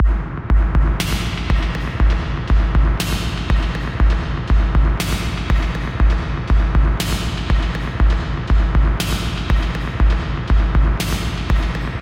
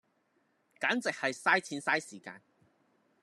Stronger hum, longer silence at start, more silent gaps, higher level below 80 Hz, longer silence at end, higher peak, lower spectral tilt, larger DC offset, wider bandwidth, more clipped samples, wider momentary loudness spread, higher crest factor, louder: neither; second, 0 s vs 0.8 s; neither; first, -18 dBFS vs under -90 dBFS; second, 0 s vs 0.85 s; first, -4 dBFS vs -12 dBFS; first, -5.5 dB/octave vs -3 dB/octave; neither; first, 16 kHz vs 13.5 kHz; neither; second, 5 LU vs 18 LU; second, 12 dB vs 24 dB; first, -19 LUFS vs -31 LUFS